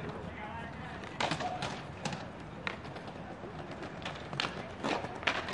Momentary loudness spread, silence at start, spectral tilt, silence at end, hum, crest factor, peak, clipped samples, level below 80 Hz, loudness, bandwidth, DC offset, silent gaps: 10 LU; 0 s; -4.5 dB/octave; 0 s; none; 32 dB; -8 dBFS; under 0.1%; -60 dBFS; -39 LUFS; 11.5 kHz; under 0.1%; none